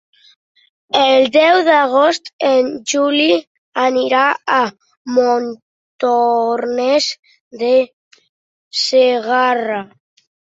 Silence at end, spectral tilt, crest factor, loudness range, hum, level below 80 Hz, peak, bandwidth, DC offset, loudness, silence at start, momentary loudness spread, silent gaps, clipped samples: 0.55 s; -2.5 dB/octave; 16 dB; 4 LU; none; -66 dBFS; 0 dBFS; 7.8 kHz; under 0.1%; -15 LUFS; 0.95 s; 11 LU; 2.33-2.39 s, 3.47-3.72 s, 4.97-5.05 s, 5.62-5.99 s, 7.19-7.23 s, 7.40-7.51 s, 7.93-8.11 s, 8.29-8.71 s; under 0.1%